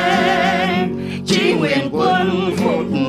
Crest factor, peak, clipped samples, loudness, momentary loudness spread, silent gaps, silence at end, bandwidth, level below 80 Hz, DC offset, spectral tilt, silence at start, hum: 12 dB; -4 dBFS; under 0.1%; -17 LUFS; 4 LU; none; 0 s; 14.5 kHz; -56 dBFS; under 0.1%; -5.5 dB/octave; 0 s; none